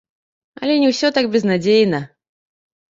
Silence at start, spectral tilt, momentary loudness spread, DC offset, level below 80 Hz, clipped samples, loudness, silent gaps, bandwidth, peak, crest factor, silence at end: 0.6 s; -5.5 dB/octave; 11 LU; under 0.1%; -62 dBFS; under 0.1%; -17 LUFS; none; 7.8 kHz; -4 dBFS; 16 dB; 0.85 s